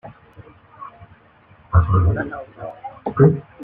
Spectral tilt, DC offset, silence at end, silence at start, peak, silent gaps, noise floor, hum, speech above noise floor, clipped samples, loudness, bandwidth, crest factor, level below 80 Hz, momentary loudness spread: -12 dB/octave; under 0.1%; 0 s; 0.05 s; -2 dBFS; none; -51 dBFS; none; 34 dB; under 0.1%; -19 LUFS; 3.3 kHz; 18 dB; -36 dBFS; 24 LU